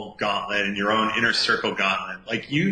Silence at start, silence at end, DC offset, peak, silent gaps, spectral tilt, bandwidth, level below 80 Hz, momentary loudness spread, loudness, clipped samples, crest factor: 0 s; 0 s; under 0.1%; -8 dBFS; none; -4 dB/octave; 10 kHz; -58 dBFS; 7 LU; -23 LUFS; under 0.1%; 16 dB